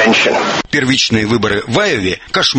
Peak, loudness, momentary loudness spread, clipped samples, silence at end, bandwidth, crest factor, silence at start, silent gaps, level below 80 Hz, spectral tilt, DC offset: 0 dBFS; -13 LUFS; 4 LU; under 0.1%; 0 s; 8.8 kHz; 14 dB; 0 s; none; -42 dBFS; -3.5 dB/octave; under 0.1%